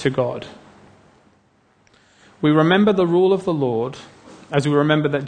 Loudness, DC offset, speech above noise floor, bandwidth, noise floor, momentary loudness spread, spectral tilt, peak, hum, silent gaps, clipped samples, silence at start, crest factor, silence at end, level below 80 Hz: -18 LUFS; under 0.1%; 41 dB; 9.6 kHz; -59 dBFS; 14 LU; -7 dB/octave; -2 dBFS; none; none; under 0.1%; 0 s; 18 dB; 0 s; -58 dBFS